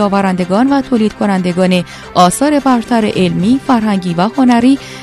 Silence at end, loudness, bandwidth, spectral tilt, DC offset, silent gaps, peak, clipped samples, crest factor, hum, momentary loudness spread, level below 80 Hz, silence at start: 0 s; -12 LUFS; 14 kHz; -6 dB/octave; under 0.1%; none; 0 dBFS; 0.2%; 12 dB; none; 5 LU; -42 dBFS; 0 s